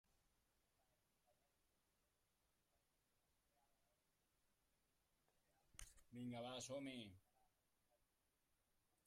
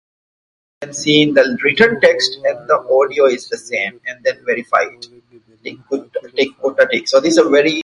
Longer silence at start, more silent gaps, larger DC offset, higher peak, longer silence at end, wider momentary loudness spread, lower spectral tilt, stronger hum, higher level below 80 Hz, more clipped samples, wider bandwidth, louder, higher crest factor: first, 5.75 s vs 0.8 s; neither; neither; second, -36 dBFS vs 0 dBFS; first, 1.85 s vs 0 s; about the same, 12 LU vs 13 LU; about the same, -4 dB/octave vs -3.5 dB/octave; neither; second, -82 dBFS vs -60 dBFS; neither; first, 13.5 kHz vs 11.5 kHz; second, -55 LUFS vs -15 LUFS; first, 26 dB vs 16 dB